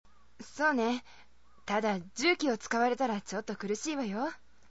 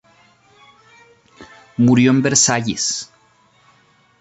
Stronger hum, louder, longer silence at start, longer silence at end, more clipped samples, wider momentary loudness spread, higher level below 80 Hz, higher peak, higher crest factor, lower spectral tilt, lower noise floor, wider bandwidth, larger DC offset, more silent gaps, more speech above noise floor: neither; second, -32 LUFS vs -15 LUFS; second, 0.4 s vs 1.4 s; second, 0.35 s vs 1.15 s; neither; second, 11 LU vs 15 LU; second, -68 dBFS vs -56 dBFS; second, -14 dBFS vs -2 dBFS; about the same, 18 dB vs 18 dB; about the same, -4 dB/octave vs -4 dB/octave; about the same, -53 dBFS vs -55 dBFS; about the same, 8 kHz vs 8.4 kHz; first, 0.2% vs under 0.1%; neither; second, 22 dB vs 40 dB